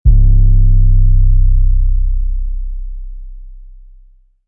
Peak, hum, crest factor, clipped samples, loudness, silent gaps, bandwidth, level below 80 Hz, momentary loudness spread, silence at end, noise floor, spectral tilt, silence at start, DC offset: 0 dBFS; none; 10 dB; under 0.1%; -15 LUFS; none; 0.5 kHz; -10 dBFS; 20 LU; 0.85 s; -44 dBFS; -16.5 dB/octave; 0.05 s; under 0.1%